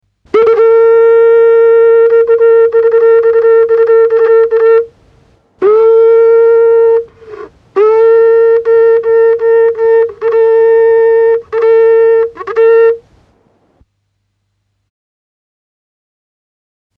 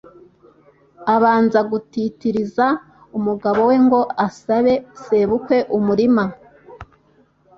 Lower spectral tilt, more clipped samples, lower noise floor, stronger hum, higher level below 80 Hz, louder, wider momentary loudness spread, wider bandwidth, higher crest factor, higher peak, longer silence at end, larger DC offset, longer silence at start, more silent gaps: second, -6 dB/octave vs -7.5 dB/octave; neither; first, -64 dBFS vs -56 dBFS; neither; about the same, -54 dBFS vs -54 dBFS; first, -7 LUFS vs -18 LUFS; second, 5 LU vs 9 LU; second, 3.9 kHz vs 7.4 kHz; second, 8 dB vs 16 dB; about the same, 0 dBFS vs -2 dBFS; first, 4 s vs 0.75 s; neither; second, 0.35 s vs 1 s; neither